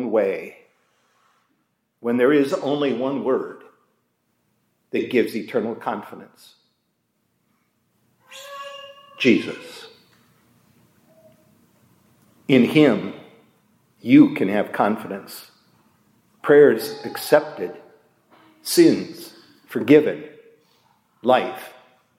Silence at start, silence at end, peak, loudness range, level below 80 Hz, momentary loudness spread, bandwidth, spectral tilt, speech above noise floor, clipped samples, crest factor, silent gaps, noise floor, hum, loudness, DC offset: 0 s; 0.5 s; -2 dBFS; 9 LU; -76 dBFS; 24 LU; 16.5 kHz; -5.5 dB/octave; 52 dB; under 0.1%; 22 dB; none; -71 dBFS; none; -20 LUFS; under 0.1%